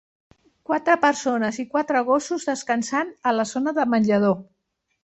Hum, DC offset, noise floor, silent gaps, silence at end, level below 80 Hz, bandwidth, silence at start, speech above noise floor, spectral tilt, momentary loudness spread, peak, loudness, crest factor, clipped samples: none; under 0.1%; -75 dBFS; none; 0.6 s; -66 dBFS; 8.4 kHz; 0.7 s; 54 dB; -5 dB/octave; 7 LU; -6 dBFS; -22 LUFS; 18 dB; under 0.1%